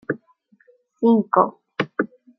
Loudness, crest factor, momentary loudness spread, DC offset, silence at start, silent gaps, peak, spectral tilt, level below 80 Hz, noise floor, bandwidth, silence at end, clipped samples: -21 LUFS; 20 dB; 13 LU; under 0.1%; 0.1 s; none; -2 dBFS; -8.5 dB/octave; -74 dBFS; -60 dBFS; 6 kHz; 0.3 s; under 0.1%